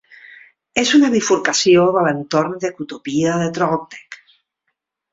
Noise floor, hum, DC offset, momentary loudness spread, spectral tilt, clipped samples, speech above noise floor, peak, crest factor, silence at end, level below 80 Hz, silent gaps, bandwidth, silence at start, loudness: -74 dBFS; none; under 0.1%; 12 LU; -4 dB/octave; under 0.1%; 58 dB; -2 dBFS; 16 dB; 1 s; -58 dBFS; none; 7.8 kHz; 0.75 s; -16 LUFS